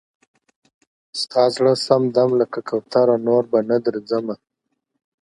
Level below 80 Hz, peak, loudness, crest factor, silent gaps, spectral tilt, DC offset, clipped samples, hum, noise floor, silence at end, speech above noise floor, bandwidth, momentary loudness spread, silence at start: -70 dBFS; 0 dBFS; -19 LUFS; 20 dB; none; -6 dB/octave; under 0.1%; under 0.1%; none; -76 dBFS; 0.85 s; 58 dB; 11.5 kHz; 10 LU; 1.15 s